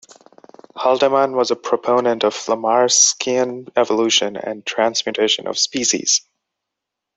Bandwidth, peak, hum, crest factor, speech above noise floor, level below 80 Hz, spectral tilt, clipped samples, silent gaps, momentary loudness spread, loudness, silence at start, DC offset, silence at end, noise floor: 8.4 kHz; -2 dBFS; none; 18 dB; 64 dB; -66 dBFS; -1 dB/octave; under 0.1%; none; 7 LU; -17 LUFS; 0.75 s; under 0.1%; 0.95 s; -82 dBFS